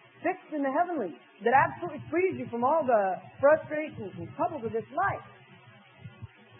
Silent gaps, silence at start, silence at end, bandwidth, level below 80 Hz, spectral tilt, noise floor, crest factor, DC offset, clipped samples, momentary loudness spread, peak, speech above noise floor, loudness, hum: none; 0.2 s; 0.35 s; 3.6 kHz; -68 dBFS; -10.5 dB/octave; -54 dBFS; 20 dB; under 0.1%; under 0.1%; 15 LU; -10 dBFS; 26 dB; -29 LUFS; none